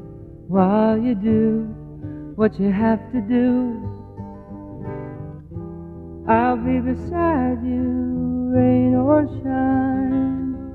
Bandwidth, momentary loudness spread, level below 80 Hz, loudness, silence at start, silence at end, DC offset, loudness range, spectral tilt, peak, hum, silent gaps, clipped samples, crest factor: 4.4 kHz; 18 LU; -42 dBFS; -20 LUFS; 0 s; 0 s; under 0.1%; 6 LU; -11 dB/octave; -2 dBFS; none; none; under 0.1%; 18 dB